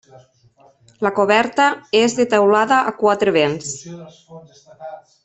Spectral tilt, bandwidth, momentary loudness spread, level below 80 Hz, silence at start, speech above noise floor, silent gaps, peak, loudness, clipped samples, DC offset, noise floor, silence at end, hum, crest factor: -4 dB/octave; 8.4 kHz; 22 LU; -62 dBFS; 1 s; 36 dB; none; -2 dBFS; -16 LUFS; under 0.1%; under 0.1%; -53 dBFS; 0.3 s; none; 16 dB